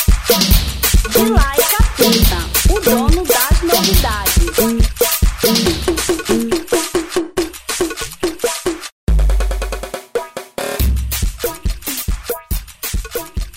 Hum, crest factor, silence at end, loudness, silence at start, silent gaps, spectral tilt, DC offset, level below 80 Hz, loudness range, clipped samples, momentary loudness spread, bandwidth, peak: none; 14 dB; 0 s; -16 LUFS; 0 s; 8.92-9.07 s; -4 dB/octave; under 0.1%; -18 dBFS; 8 LU; under 0.1%; 11 LU; 16.5 kHz; 0 dBFS